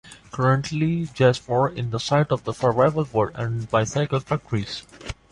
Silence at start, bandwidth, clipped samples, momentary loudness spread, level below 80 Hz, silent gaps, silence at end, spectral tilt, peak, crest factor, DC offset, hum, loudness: 0.05 s; 11 kHz; under 0.1%; 9 LU; -50 dBFS; none; 0.2 s; -6 dB/octave; -6 dBFS; 18 dB; under 0.1%; none; -23 LUFS